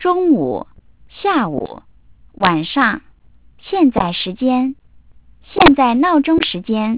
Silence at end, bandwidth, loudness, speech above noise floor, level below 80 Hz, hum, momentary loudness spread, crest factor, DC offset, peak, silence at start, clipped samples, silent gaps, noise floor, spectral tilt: 0 s; 4 kHz; -15 LUFS; 34 dB; -42 dBFS; none; 12 LU; 16 dB; 0.4%; 0 dBFS; 0 s; under 0.1%; none; -49 dBFS; -9.5 dB/octave